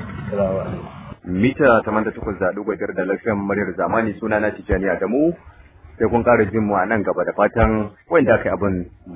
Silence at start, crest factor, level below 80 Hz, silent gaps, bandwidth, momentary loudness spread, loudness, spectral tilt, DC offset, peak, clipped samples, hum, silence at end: 0 s; 18 dB; -36 dBFS; none; 4 kHz; 10 LU; -20 LUFS; -11.5 dB/octave; under 0.1%; -2 dBFS; under 0.1%; none; 0 s